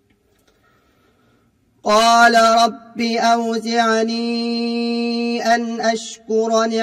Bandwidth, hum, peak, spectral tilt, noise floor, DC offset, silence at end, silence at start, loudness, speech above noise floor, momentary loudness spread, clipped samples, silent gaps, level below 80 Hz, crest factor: 15.5 kHz; none; 0 dBFS; -3 dB/octave; -59 dBFS; under 0.1%; 0 s; 1.85 s; -17 LUFS; 42 dB; 10 LU; under 0.1%; none; -60 dBFS; 18 dB